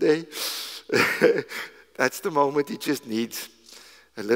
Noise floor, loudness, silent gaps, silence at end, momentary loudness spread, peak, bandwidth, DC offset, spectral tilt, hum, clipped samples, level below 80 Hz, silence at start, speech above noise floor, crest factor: -49 dBFS; -25 LUFS; none; 0 s; 16 LU; -4 dBFS; 16 kHz; under 0.1%; -3.5 dB/octave; none; under 0.1%; -72 dBFS; 0 s; 25 dB; 22 dB